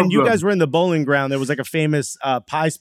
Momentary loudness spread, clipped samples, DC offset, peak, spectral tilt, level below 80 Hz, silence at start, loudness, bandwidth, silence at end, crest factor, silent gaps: 6 LU; under 0.1%; under 0.1%; -2 dBFS; -5.5 dB/octave; -64 dBFS; 0 s; -19 LUFS; 15.5 kHz; 0.05 s; 16 dB; none